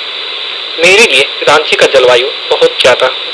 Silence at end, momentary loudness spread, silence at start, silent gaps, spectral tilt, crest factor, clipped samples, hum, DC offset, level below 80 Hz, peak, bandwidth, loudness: 0 s; 12 LU; 0 s; none; -1.5 dB/octave; 8 dB; 1%; none; under 0.1%; -50 dBFS; 0 dBFS; 11 kHz; -7 LUFS